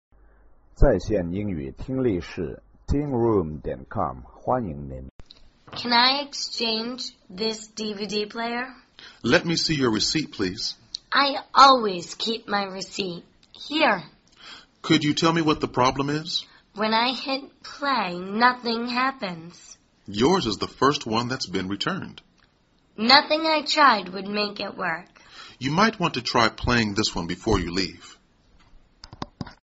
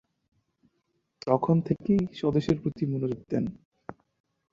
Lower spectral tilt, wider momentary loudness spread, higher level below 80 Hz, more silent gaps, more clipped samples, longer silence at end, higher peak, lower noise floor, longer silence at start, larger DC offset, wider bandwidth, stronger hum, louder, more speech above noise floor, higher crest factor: second, -2.5 dB/octave vs -9 dB/octave; second, 16 LU vs 21 LU; first, -38 dBFS vs -56 dBFS; about the same, 5.11-5.19 s vs 3.65-3.72 s; neither; second, 0.1 s vs 0.6 s; first, 0 dBFS vs -8 dBFS; second, -63 dBFS vs -76 dBFS; second, 0.8 s vs 1.25 s; neither; about the same, 8 kHz vs 7.6 kHz; neither; first, -23 LUFS vs -28 LUFS; second, 39 dB vs 49 dB; about the same, 24 dB vs 22 dB